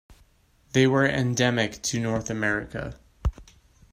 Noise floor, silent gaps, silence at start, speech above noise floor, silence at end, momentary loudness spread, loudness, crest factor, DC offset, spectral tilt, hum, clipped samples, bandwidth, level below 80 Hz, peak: -61 dBFS; none; 0.1 s; 37 dB; 0.5 s; 12 LU; -25 LUFS; 20 dB; under 0.1%; -4.5 dB/octave; none; under 0.1%; 16 kHz; -40 dBFS; -8 dBFS